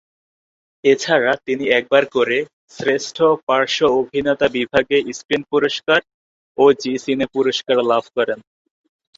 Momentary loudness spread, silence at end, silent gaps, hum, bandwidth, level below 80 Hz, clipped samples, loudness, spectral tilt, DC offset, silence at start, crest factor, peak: 7 LU; 0.75 s; 2.53-2.68 s, 3.43-3.47 s, 5.25-5.29 s, 6.14-6.55 s; none; 7.8 kHz; -56 dBFS; under 0.1%; -18 LUFS; -4 dB/octave; under 0.1%; 0.85 s; 18 dB; -2 dBFS